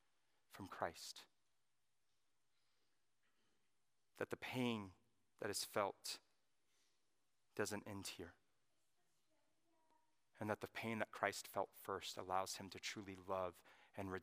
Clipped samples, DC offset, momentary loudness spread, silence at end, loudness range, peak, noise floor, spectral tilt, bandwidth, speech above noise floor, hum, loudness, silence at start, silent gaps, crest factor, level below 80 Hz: under 0.1%; under 0.1%; 13 LU; 0 s; 10 LU; -24 dBFS; under -90 dBFS; -3.5 dB/octave; 15.5 kHz; over 43 dB; none; -47 LUFS; 0.5 s; none; 26 dB; -90 dBFS